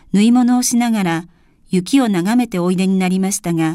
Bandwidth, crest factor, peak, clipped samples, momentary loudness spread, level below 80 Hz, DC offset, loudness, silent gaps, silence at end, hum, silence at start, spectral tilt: 15.5 kHz; 14 dB; -2 dBFS; under 0.1%; 7 LU; -52 dBFS; under 0.1%; -16 LUFS; none; 0 s; none; 0.15 s; -5 dB/octave